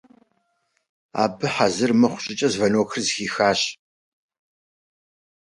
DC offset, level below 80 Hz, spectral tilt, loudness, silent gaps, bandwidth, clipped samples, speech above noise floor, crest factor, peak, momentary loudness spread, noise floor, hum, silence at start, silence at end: under 0.1%; -62 dBFS; -4 dB/octave; -21 LUFS; none; 11.5 kHz; under 0.1%; 50 dB; 20 dB; -4 dBFS; 6 LU; -71 dBFS; none; 1.15 s; 1.7 s